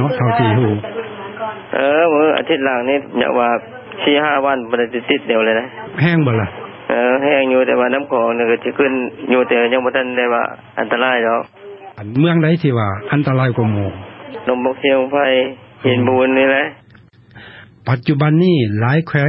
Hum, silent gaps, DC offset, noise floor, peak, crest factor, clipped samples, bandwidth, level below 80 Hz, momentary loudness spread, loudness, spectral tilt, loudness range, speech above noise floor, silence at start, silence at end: none; none; under 0.1%; -45 dBFS; 0 dBFS; 16 dB; under 0.1%; 5.8 kHz; -50 dBFS; 11 LU; -16 LUFS; -10.5 dB/octave; 2 LU; 31 dB; 0 s; 0 s